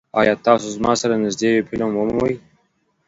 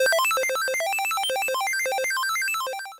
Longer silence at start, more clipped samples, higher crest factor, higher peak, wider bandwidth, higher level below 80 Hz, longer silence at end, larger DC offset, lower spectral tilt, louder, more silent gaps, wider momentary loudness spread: first, 0.15 s vs 0 s; neither; first, 20 dB vs 8 dB; first, 0 dBFS vs -18 dBFS; second, 8 kHz vs 17 kHz; first, -50 dBFS vs -72 dBFS; first, 0.7 s vs 0 s; neither; first, -4.5 dB/octave vs 2.5 dB/octave; first, -19 LUFS vs -23 LUFS; neither; about the same, 5 LU vs 3 LU